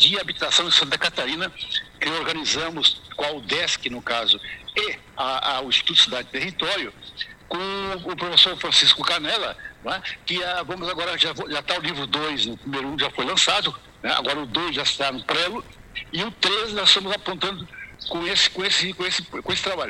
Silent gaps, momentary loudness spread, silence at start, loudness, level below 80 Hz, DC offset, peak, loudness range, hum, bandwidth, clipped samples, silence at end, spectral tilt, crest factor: none; 13 LU; 0 s; -21 LUFS; -54 dBFS; under 0.1%; 0 dBFS; 4 LU; none; 16 kHz; under 0.1%; 0 s; -1.5 dB/octave; 24 dB